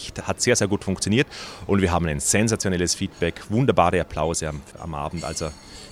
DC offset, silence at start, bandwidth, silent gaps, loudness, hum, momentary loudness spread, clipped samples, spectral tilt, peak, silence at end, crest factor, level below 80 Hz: under 0.1%; 0 s; 16 kHz; none; -23 LUFS; none; 12 LU; under 0.1%; -4.5 dB/octave; -2 dBFS; 0 s; 20 dB; -42 dBFS